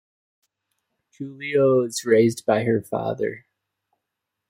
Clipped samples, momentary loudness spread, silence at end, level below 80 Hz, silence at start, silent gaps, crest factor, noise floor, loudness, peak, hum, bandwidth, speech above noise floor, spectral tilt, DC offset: under 0.1%; 17 LU; 1.1 s; -68 dBFS; 1.2 s; none; 18 dB; -82 dBFS; -21 LUFS; -6 dBFS; none; 16.5 kHz; 61 dB; -5.5 dB/octave; under 0.1%